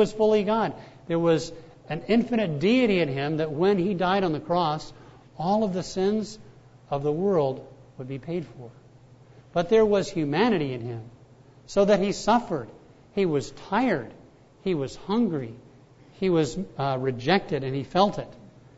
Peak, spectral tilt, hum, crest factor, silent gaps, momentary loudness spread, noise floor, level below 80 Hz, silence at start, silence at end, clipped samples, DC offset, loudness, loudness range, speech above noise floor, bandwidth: -6 dBFS; -6.5 dB/octave; none; 20 dB; none; 15 LU; -52 dBFS; -54 dBFS; 0 s; 0.3 s; under 0.1%; under 0.1%; -25 LUFS; 4 LU; 28 dB; 8 kHz